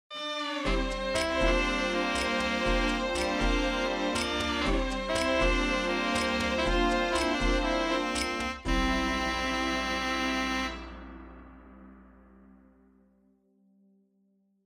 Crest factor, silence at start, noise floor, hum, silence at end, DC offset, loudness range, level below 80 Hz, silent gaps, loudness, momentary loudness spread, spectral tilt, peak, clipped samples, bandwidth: 16 dB; 0.1 s; -70 dBFS; none; 2.65 s; under 0.1%; 6 LU; -38 dBFS; none; -28 LUFS; 6 LU; -4 dB/octave; -12 dBFS; under 0.1%; 15 kHz